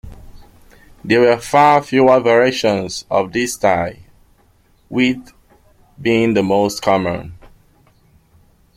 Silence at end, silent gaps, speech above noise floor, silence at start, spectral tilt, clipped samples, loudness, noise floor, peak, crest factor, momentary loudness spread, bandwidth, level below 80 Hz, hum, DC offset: 1.3 s; none; 39 dB; 0.05 s; -5 dB/octave; under 0.1%; -15 LUFS; -54 dBFS; -2 dBFS; 16 dB; 13 LU; 16 kHz; -48 dBFS; none; under 0.1%